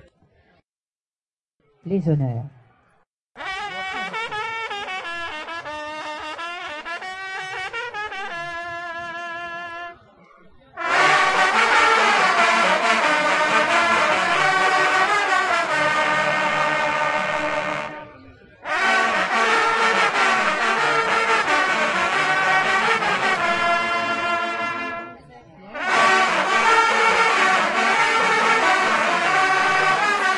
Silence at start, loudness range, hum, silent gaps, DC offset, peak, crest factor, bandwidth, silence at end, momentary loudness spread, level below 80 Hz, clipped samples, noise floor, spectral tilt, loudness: 1.85 s; 13 LU; none; 3.09-3.30 s; under 0.1%; -2 dBFS; 20 dB; 11.5 kHz; 0 s; 14 LU; -60 dBFS; under 0.1%; under -90 dBFS; -3 dB/octave; -19 LUFS